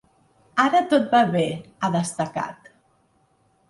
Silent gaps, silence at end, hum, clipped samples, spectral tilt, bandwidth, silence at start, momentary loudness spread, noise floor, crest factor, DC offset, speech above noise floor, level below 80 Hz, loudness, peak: none; 1.15 s; none; under 0.1%; -5.5 dB/octave; 11.5 kHz; 0.55 s; 10 LU; -63 dBFS; 18 dB; under 0.1%; 42 dB; -64 dBFS; -22 LUFS; -4 dBFS